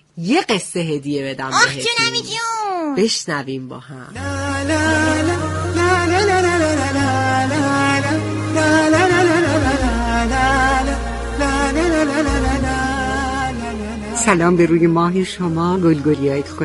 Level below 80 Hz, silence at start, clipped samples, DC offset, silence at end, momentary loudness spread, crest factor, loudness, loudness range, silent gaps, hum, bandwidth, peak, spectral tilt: -30 dBFS; 0.15 s; under 0.1%; under 0.1%; 0 s; 9 LU; 16 dB; -17 LUFS; 3 LU; none; none; 11.5 kHz; 0 dBFS; -4.5 dB/octave